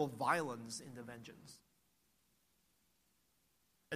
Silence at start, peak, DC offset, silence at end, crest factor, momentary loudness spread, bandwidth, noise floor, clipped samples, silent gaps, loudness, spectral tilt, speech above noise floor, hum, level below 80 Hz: 0 s; -20 dBFS; under 0.1%; 0 s; 24 dB; 21 LU; 15 kHz; -79 dBFS; under 0.1%; none; -40 LUFS; -4 dB/octave; 36 dB; none; -82 dBFS